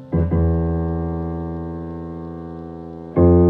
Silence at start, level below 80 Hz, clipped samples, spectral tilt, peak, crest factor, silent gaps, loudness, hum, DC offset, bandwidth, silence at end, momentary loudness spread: 0 s; -36 dBFS; under 0.1%; -13 dB/octave; -2 dBFS; 18 dB; none; -22 LUFS; none; under 0.1%; 2.4 kHz; 0 s; 15 LU